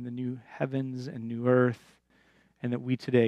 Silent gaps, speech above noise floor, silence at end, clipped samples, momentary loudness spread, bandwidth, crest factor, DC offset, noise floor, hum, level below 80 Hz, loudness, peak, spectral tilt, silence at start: none; 36 dB; 0 s; under 0.1%; 13 LU; 8.6 kHz; 18 dB; under 0.1%; -65 dBFS; none; -74 dBFS; -30 LUFS; -10 dBFS; -8.5 dB/octave; 0 s